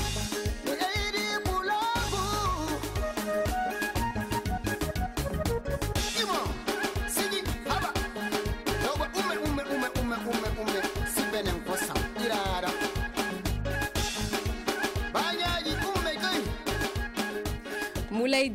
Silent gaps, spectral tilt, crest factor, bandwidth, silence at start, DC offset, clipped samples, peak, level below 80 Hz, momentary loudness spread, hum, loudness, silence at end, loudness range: none; -4 dB/octave; 14 dB; 16.5 kHz; 0 s; under 0.1%; under 0.1%; -16 dBFS; -38 dBFS; 4 LU; none; -30 LUFS; 0 s; 1 LU